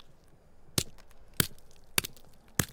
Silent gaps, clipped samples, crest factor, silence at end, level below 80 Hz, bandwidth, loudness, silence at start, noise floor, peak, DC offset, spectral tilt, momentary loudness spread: none; under 0.1%; 32 dB; 0 s; -54 dBFS; 18 kHz; -33 LUFS; 0 s; -55 dBFS; -4 dBFS; under 0.1%; -2.5 dB/octave; 7 LU